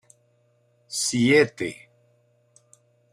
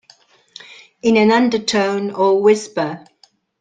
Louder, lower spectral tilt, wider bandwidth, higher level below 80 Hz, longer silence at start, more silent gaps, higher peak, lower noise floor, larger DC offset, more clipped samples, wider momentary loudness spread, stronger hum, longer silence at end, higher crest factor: second, -22 LUFS vs -16 LUFS; about the same, -4 dB/octave vs -4.5 dB/octave; first, 15.5 kHz vs 9.4 kHz; second, -66 dBFS vs -60 dBFS; second, 0.9 s vs 1.05 s; neither; second, -6 dBFS vs -2 dBFS; first, -65 dBFS vs -51 dBFS; neither; neither; second, 14 LU vs 18 LU; first, 60 Hz at -45 dBFS vs none; first, 1.4 s vs 0.65 s; about the same, 20 dB vs 16 dB